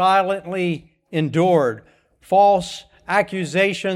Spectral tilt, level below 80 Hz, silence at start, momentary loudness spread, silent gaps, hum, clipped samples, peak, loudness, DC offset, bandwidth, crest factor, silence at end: -5.5 dB/octave; -58 dBFS; 0 s; 14 LU; none; none; under 0.1%; -4 dBFS; -19 LUFS; under 0.1%; 13.5 kHz; 16 dB; 0 s